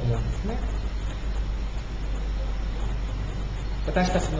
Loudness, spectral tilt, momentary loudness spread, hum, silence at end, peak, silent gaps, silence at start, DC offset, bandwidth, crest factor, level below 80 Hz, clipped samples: -30 LUFS; -6 dB/octave; 7 LU; none; 0 s; -10 dBFS; none; 0 s; under 0.1%; 7.8 kHz; 16 dB; -28 dBFS; under 0.1%